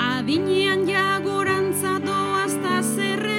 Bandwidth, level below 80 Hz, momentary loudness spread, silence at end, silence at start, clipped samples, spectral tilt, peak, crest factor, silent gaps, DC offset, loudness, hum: 17 kHz; -70 dBFS; 3 LU; 0 s; 0 s; under 0.1%; -4 dB/octave; -8 dBFS; 14 dB; none; under 0.1%; -21 LUFS; none